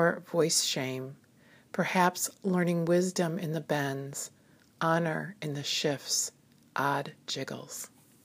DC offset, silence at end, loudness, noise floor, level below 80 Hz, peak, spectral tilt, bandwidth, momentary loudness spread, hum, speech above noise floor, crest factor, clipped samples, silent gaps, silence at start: under 0.1%; 0.4 s; -30 LUFS; -60 dBFS; -80 dBFS; -10 dBFS; -4 dB/octave; 15.5 kHz; 13 LU; none; 30 dB; 22 dB; under 0.1%; none; 0 s